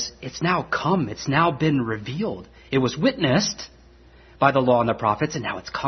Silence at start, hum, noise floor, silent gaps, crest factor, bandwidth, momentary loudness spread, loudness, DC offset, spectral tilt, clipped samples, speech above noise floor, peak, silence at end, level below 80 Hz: 0 s; none; -50 dBFS; none; 22 dB; 6.4 kHz; 9 LU; -22 LUFS; under 0.1%; -5 dB/octave; under 0.1%; 28 dB; -2 dBFS; 0 s; -52 dBFS